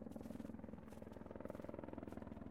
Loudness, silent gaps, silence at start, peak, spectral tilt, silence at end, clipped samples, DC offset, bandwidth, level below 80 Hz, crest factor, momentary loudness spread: -53 LUFS; none; 0 s; -34 dBFS; -8 dB/octave; 0 s; under 0.1%; under 0.1%; 16 kHz; -66 dBFS; 18 dB; 4 LU